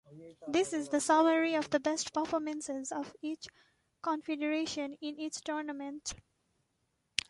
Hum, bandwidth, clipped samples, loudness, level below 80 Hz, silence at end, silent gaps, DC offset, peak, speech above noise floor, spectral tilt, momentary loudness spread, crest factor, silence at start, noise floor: none; 11.5 kHz; under 0.1%; -34 LUFS; -70 dBFS; 1.15 s; none; under 0.1%; -6 dBFS; 46 dB; -2.5 dB/octave; 13 LU; 28 dB; 0.1 s; -80 dBFS